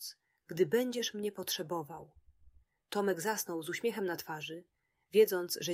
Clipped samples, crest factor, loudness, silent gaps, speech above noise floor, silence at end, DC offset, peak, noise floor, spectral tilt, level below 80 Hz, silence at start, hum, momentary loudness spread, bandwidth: under 0.1%; 20 dB; -34 LUFS; none; 30 dB; 0 s; under 0.1%; -16 dBFS; -64 dBFS; -3.5 dB/octave; -74 dBFS; 0 s; none; 16 LU; 16 kHz